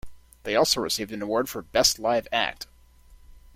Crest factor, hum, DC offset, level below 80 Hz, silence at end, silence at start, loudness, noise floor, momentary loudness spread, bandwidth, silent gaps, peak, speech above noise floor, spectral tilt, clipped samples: 20 dB; none; under 0.1%; -52 dBFS; 0.2 s; 0.05 s; -24 LUFS; -53 dBFS; 13 LU; 16.5 kHz; none; -6 dBFS; 28 dB; -2 dB/octave; under 0.1%